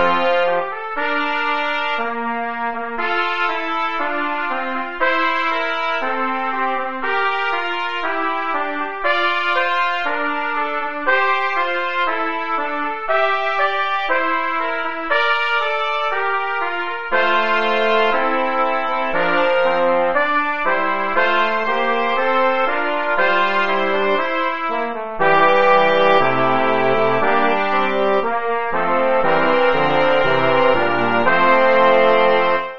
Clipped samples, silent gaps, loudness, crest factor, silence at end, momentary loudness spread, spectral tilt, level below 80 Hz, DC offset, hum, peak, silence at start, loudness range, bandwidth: under 0.1%; none; -18 LUFS; 16 dB; 0 s; 7 LU; -5.5 dB/octave; -54 dBFS; 3%; none; 0 dBFS; 0 s; 5 LU; 7 kHz